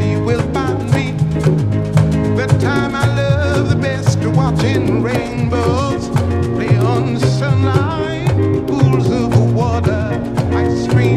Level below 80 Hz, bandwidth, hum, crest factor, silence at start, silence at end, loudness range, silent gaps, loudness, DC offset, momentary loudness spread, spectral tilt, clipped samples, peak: -32 dBFS; 12.5 kHz; none; 14 dB; 0 s; 0 s; 1 LU; none; -15 LUFS; under 0.1%; 4 LU; -7.5 dB/octave; under 0.1%; 0 dBFS